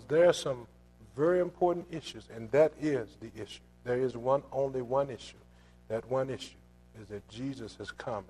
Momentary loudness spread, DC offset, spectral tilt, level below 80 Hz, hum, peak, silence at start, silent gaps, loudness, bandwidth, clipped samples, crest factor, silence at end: 18 LU; under 0.1%; -6 dB/octave; -60 dBFS; 60 Hz at -60 dBFS; -12 dBFS; 0 s; none; -32 LUFS; 12.5 kHz; under 0.1%; 20 dB; 0.05 s